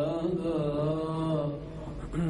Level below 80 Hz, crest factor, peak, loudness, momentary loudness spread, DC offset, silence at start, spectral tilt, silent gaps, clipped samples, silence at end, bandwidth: -46 dBFS; 12 dB; -18 dBFS; -31 LUFS; 10 LU; under 0.1%; 0 s; -8.5 dB/octave; none; under 0.1%; 0 s; 10.5 kHz